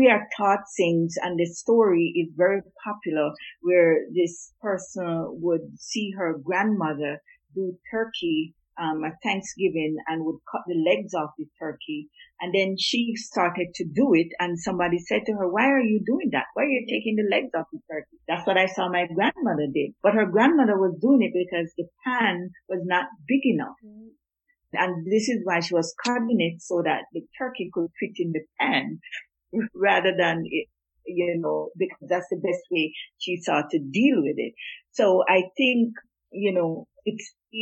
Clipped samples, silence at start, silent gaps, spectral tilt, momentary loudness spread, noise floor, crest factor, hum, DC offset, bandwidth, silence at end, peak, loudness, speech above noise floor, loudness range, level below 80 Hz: under 0.1%; 0 s; none; -5 dB/octave; 12 LU; -73 dBFS; 20 dB; none; under 0.1%; 8.4 kHz; 0 s; -4 dBFS; -25 LUFS; 49 dB; 5 LU; -68 dBFS